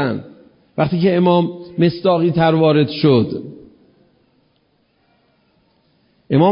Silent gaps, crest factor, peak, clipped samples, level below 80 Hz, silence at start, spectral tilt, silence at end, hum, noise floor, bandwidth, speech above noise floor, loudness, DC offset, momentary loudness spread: none; 16 dB; -2 dBFS; under 0.1%; -54 dBFS; 0 s; -12.5 dB/octave; 0 s; none; -61 dBFS; 5.4 kHz; 46 dB; -16 LUFS; under 0.1%; 13 LU